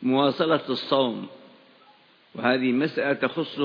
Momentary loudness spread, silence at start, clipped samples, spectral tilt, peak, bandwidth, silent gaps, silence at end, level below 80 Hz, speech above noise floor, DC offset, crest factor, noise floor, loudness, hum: 10 LU; 0 s; under 0.1%; -7.5 dB/octave; -6 dBFS; 5.2 kHz; none; 0 s; -76 dBFS; 33 dB; under 0.1%; 18 dB; -57 dBFS; -24 LUFS; none